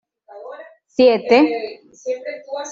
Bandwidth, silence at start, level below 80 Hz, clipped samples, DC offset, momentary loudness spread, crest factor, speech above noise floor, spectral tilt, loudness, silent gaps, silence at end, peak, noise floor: 7.4 kHz; 0.35 s; -66 dBFS; under 0.1%; under 0.1%; 22 LU; 16 dB; 21 dB; -4 dB/octave; -17 LUFS; none; 0 s; -2 dBFS; -38 dBFS